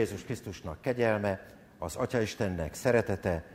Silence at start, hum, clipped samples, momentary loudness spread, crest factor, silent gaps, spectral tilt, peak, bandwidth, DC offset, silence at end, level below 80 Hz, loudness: 0 s; none; under 0.1%; 12 LU; 20 dB; none; -6 dB/octave; -12 dBFS; 16 kHz; under 0.1%; 0 s; -52 dBFS; -32 LUFS